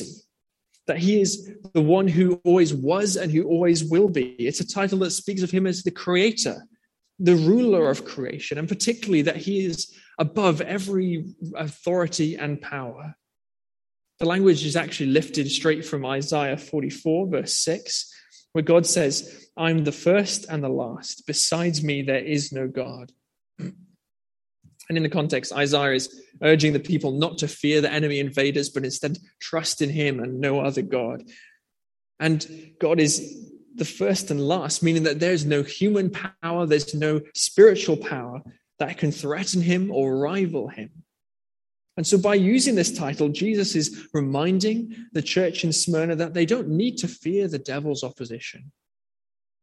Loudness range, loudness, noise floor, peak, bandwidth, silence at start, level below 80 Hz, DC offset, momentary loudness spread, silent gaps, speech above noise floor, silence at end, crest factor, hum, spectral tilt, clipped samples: 5 LU; -23 LUFS; under -90 dBFS; -4 dBFS; 12.5 kHz; 0 s; -66 dBFS; under 0.1%; 13 LU; none; over 67 dB; 0.95 s; 20 dB; none; -4.5 dB/octave; under 0.1%